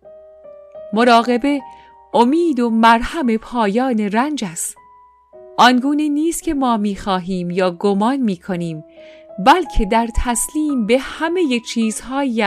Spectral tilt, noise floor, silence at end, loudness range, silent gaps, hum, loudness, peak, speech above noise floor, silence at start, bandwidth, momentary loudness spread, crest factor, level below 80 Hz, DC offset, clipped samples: -4.5 dB/octave; -48 dBFS; 0 s; 3 LU; none; none; -17 LUFS; -2 dBFS; 32 dB; 0.05 s; 15.5 kHz; 11 LU; 16 dB; -34 dBFS; under 0.1%; under 0.1%